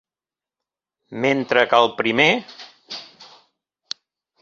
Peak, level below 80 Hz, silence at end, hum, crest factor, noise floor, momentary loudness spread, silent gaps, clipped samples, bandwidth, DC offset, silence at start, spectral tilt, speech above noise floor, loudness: 0 dBFS; -66 dBFS; 1.2 s; none; 22 dB; under -90 dBFS; 20 LU; none; under 0.1%; 7.8 kHz; under 0.1%; 1.1 s; -4.5 dB/octave; over 72 dB; -18 LUFS